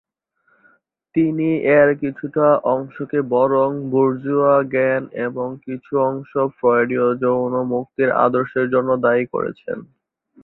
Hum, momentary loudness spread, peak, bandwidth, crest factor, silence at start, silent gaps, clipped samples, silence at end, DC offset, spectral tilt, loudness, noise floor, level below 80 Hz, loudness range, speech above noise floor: none; 9 LU; -2 dBFS; 4.1 kHz; 18 dB; 1.15 s; none; under 0.1%; 0.6 s; under 0.1%; -11.5 dB/octave; -18 LUFS; -64 dBFS; -62 dBFS; 2 LU; 46 dB